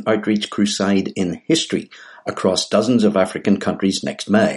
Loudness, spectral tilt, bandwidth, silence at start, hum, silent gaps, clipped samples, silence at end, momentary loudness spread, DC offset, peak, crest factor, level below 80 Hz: -19 LUFS; -5 dB/octave; 11.5 kHz; 0 s; none; none; under 0.1%; 0 s; 8 LU; under 0.1%; -2 dBFS; 16 dB; -58 dBFS